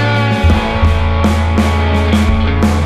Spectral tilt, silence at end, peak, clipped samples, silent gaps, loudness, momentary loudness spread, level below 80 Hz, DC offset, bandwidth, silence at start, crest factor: -6.5 dB/octave; 0 s; 0 dBFS; under 0.1%; none; -13 LUFS; 1 LU; -16 dBFS; under 0.1%; 12.5 kHz; 0 s; 10 dB